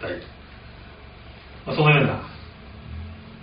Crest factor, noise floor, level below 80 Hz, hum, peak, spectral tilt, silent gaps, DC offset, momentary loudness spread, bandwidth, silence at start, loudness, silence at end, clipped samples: 22 dB; -43 dBFS; -46 dBFS; none; -4 dBFS; -4.5 dB/octave; none; under 0.1%; 26 LU; 5.2 kHz; 0 s; -20 LUFS; 0 s; under 0.1%